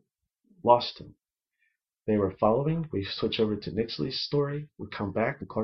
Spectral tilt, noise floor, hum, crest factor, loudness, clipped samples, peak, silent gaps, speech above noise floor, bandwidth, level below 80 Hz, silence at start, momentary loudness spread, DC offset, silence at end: -7.5 dB/octave; -76 dBFS; none; 24 dB; -28 LUFS; under 0.1%; -6 dBFS; none; 48 dB; 6.2 kHz; -58 dBFS; 0.65 s; 12 LU; under 0.1%; 0 s